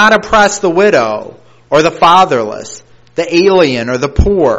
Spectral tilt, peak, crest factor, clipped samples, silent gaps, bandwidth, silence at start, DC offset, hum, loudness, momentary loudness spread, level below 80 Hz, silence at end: -4.5 dB/octave; 0 dBFS; 10 dB; 0.6%; none; 10.5 kHz; 0 s; under 0.1%; none; -10 LUFS; 14 LU; -26 dBFS; 0 s